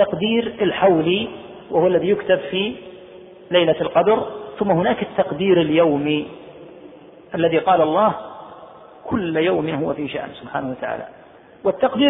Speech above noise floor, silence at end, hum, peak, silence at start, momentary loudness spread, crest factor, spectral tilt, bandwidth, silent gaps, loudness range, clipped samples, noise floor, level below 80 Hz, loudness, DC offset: 24 dB; 0 s; none; -4 dBFS; 0 s; 16 LU; 16 dB; -10 dB/octave; 3.9 kHz; none; 5 LU; under 0.1%; -42 dBFS; -54 dBFS; -19 LUFS; under 0.1%